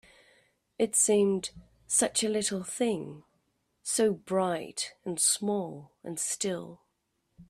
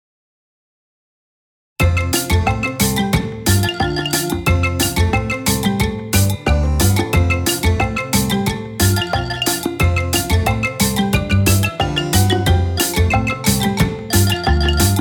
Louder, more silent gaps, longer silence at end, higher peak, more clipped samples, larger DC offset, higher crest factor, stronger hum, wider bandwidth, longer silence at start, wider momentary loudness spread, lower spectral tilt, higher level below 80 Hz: second, -28 LUFS vs -16 LUFS; neither; about the same, 0.05 s vs 0 s; second, -12 dBFS vs 0 dBFS; neither; neither; about the same, 18 dB vs 16 dB; neither; second, 15.5 kHz vs over 20 kHz; second, 0.8 s vs 1.8 s; first, 16 LU vs 4 LU; second, -3 dB/octave vs -4.5 dB/octave; second, -68 dBFS vs -26 dBFS